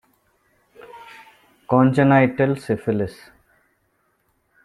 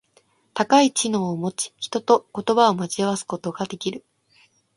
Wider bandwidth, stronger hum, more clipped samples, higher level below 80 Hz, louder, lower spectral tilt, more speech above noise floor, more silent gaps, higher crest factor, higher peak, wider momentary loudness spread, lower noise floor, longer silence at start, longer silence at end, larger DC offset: about the same, 12 kHz vs 11.5 kHz; neither; neither; first, -58 dBFS vs -68 dBFS; first, -19 LUFS vs -22 LUFS; first, -8.5 dB/octave vs -4 dB/octave; first, 49 dB vs 40 dB; neither; about the same, 20 dB vs 20 dB; about the same, -2 dBFS vs -2 dBFS; first, 26 LU vs 13 LU; first, -67 dBFS vs -61 dBFS; first, 0.95 s vs 0.55 s; first, 1.5 s vs 0.8 s; neither